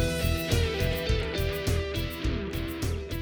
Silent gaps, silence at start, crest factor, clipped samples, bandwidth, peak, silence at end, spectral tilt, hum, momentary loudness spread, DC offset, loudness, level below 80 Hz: none; 0 s; 18 dB; under 0.1%; over 20 kHz; -10 dBFS; 0 s; -5 dB/octave; none; 5 LU; under 0.1%; -29 LUFS; -34 dBFS